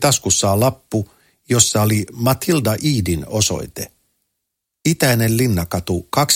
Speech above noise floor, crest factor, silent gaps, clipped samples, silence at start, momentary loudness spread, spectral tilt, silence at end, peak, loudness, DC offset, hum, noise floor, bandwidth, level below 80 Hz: 61 dB; 18 dB; none; under 0.1%; 0 s; 10 LU; -4 dB/octave; 0 s; 0 dBFS; -17 LUFS; under 0.1%; none; -78 dBFS; 17 kHz; -42 dBFS